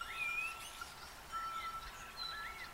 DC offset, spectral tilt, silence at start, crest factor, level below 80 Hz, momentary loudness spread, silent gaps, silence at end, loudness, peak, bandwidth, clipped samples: under 0.1%; -1 dB/octave; 0 s; 14 dB; -62 dBFS; 11 LU; none; 0 s; -43 LUFS; -30 dBFS; 16 kHz; under 0.1%